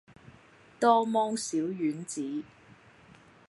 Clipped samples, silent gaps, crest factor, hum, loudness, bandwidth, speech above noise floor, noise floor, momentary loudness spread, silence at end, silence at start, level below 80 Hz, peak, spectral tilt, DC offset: under 0.1%; none; 22 dB; none; -29 LUFS; 11.5 kHz; 29 dB; -57 dBFS; 13 LU; 1.05 s; 0.25 s; -74 dBFS; -10 dBFS; -4.5 dB/octave; under 0.1%